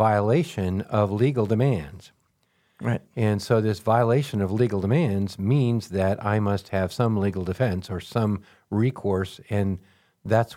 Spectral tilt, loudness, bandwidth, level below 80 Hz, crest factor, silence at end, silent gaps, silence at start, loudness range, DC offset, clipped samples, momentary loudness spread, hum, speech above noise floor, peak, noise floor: -8 dB/octave; -24 LUFS; 15 kHz; -54 dBFS; 18 dB; 0 s; none; 0 s; 3 LU; under 0.1%; under 0.1%; 7 LU; none; 45 dB; -6 dBFS; -68 dBFS